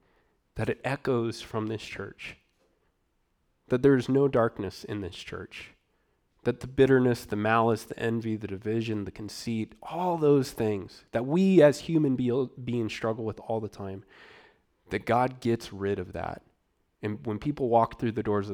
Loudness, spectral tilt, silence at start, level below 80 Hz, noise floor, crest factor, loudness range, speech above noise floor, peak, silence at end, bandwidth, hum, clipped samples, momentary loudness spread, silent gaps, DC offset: -28 LUFS; -7 dB/octave; 0.55 s; -58 dBFS; -73 dBFS; 20 dB; 7 LU; 46 dB; -8 dBFS; 0 s; 16.5 kHz; none; under 0.1%; 15 LU; none; under 0.1%